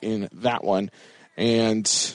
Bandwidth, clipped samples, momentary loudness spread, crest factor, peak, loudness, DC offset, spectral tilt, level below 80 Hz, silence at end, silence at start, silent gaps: 11 kHz; under 0.1%; 11 LU; 16 dB; -10 dBFS; -23 LUFS; under 0.1%; -3.5 dB/octave; -64 dBFS; 0 s; 0 s; none